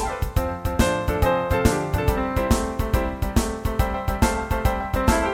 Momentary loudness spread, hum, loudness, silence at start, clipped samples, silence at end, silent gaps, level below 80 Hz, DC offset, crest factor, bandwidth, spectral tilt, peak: 5 LU; none; -23 LUFS; 0 s; under 0.1%; 0 s; none; -28 dBFS; under 0.1%; 18 dB; 17 kHz; -5.5 dB/octave; -4 dBFS